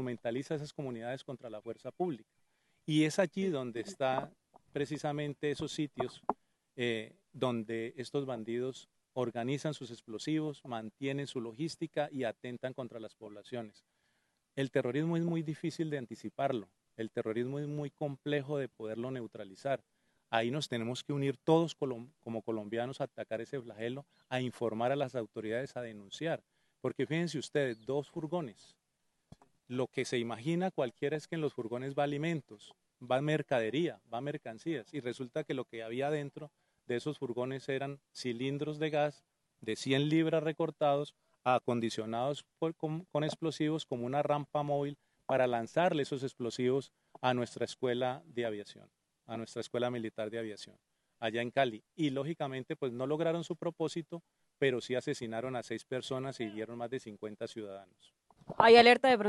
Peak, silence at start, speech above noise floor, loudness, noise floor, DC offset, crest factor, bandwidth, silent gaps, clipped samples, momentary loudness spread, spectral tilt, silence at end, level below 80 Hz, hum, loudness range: -8 dBFS; 0 s; 46 dB; -35 LUFS; -81 dBFS; under 0.1%; 28 dB; 12 kHz; none; under 0.1%; 12 LU; -6 dB/octave; 0 s; -78 dBFS; none; 5 LU